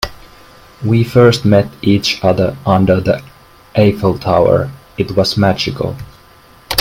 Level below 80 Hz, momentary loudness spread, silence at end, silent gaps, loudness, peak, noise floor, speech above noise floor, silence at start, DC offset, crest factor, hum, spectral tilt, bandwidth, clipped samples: -40 dBFS; 12 LU; 0 s; none; -13 LUFS; 0 dBFS; -43 dBFS; 31 dB; 0 s; under 0.1%; 14 dB; none; -6 dB/octave; 16.5 kHz; under 0.1%